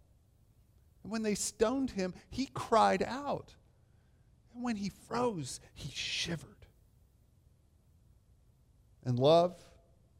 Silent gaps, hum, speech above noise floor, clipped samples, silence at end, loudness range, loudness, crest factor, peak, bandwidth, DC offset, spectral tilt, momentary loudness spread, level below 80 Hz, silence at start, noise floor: none; none; 33 dB; under 0.1%; 0.65 s; 9 LU; -33 LUFS; 22 dB; -14 dBFS; 16 kHz; under 0.1%; -4.5 dB/octave; 16 LU; -62 dBFS; 1.05 s; -66 dBFS